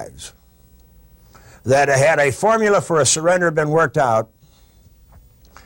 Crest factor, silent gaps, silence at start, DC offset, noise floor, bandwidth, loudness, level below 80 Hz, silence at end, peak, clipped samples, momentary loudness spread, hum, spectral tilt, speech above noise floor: 12 dB; none; 0 s; under 0.1%; -50 dBFS; 16.5 kHz; -16 LUFS; -50 dBFS; 1.4 s; -6 dBFS; under 0.1%; 20 LU; none; -4 dB/octave; 34 dB